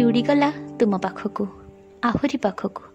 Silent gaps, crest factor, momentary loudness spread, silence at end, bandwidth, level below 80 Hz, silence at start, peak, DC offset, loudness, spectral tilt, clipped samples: none; 16 dB; 11 LU; 0.1 s; 8.4 kHz; -52 dBFS; 0 s; -8 dBFS; under 0.1%; -23 LUFS; -7 dB/octave; under 0.1%